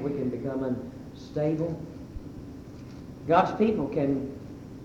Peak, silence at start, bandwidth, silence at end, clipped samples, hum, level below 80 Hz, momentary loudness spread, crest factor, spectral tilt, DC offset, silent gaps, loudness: -6 dBFS; 0 s; 10 kHz; 0 s; under 0.1%; none; -52 dBFS; 19 LU; 22 dB; -8 dB/octave; under 0.1%; none; -28 LUFS